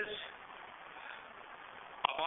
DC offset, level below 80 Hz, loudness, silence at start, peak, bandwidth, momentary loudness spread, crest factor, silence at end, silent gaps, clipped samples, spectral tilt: under 0.1%; -76 dBFS; -45 LUFS; 0 s; -10 dBFS; 3.9 kHz; 13 LU; 32 dB; 0 s; none; under 0.1%; 3.5 dB/octave